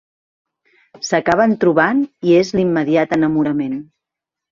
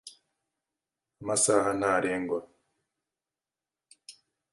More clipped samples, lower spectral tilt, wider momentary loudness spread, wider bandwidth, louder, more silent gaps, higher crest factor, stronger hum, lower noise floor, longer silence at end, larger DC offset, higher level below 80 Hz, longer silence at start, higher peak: neither; first, -6 dB/octave vs -3 dB/octave; second, 8 LU vs 11 LU; second, 7.4 kHz vs 11.5 kHz; first, -16 LUFS vs -27 LUFS; neither; second, 16 dB vs 22 dB; neither; second, -84 dBFS vs under -90 dBFS; first, 0.75 s vs 0.4 s; neither; first, -54 dBFS vs -66 dBFS; first, 1 s vs 0.05 s; first, 0 dBFS vs -10 dBFS